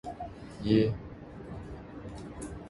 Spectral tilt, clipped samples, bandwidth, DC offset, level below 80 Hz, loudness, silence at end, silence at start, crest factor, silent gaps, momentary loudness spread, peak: -7.5 dB/octave; under 0.1%; 11.5 kHz; under 0.1%; -50 dBFS; -33 LUFS; 0 s; 0.05 s; 22 dB; none; 18 LU; -12 dBFS